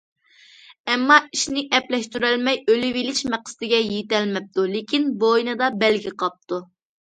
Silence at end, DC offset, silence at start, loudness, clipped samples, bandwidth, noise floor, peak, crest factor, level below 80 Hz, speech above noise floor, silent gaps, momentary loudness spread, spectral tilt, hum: 0.55 s; under 0.1%; 0.7 s; -21 LUFS; under 0.1%; 9.4 kHz; -51 dBFS; -2 dBFS; 20 dB; -64 dBFS; 30 dB; 0.80-0.84 s; 11 LU; -3 dB/octave; none